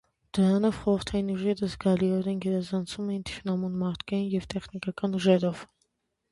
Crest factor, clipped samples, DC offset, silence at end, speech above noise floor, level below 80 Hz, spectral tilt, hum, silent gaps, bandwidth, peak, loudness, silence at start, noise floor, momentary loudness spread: 20 dB; under 0.1%; under 0.1%; 0.65 s; 48 dB; -54 dBFS; -7 dB/octave; none; none; 11.5 kHz; -8 dBFS; -28 LUFS; 0.35 s; -75 dBFS; 9 LU